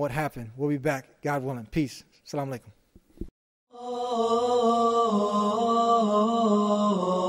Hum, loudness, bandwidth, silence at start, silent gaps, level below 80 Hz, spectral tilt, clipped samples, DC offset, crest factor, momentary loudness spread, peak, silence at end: none; -26 LUFS; 15.5 kHz; 0 s; 3.31-3.67 s; -54 dBFS; -6 dB/octave; under 0.1%; under 0.1%; 14 dB; 17 LU; -12 dBFS; 0 s